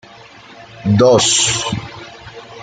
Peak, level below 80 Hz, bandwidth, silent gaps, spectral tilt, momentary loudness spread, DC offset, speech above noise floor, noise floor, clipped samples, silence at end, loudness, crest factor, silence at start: -2 dBFS; -48 dBFS; 9.6 kHz; none; -3.5 dB/octave; 24 LU; under 0.1%; 27 dB; -40 dBFS; under 0.1%; 0 s; -13 LUFS; 16 dB; 0.6 s